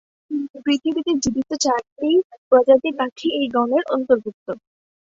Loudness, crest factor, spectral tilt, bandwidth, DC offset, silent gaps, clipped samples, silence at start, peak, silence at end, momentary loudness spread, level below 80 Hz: -20 LUFS; 18 dB; -3.5 dB/octave; 7.8 kHz; under 0.1%; 0.50-0.54 s, 1.92-1.96 s, 2.24-2.30 s, 2.38-2.51 s, 3.12-3.16 s, 4.34-4.46 s; under 0.1%; 0.3 s; -2 dBFS; 0.55 s; 12 LU; -56 dBFS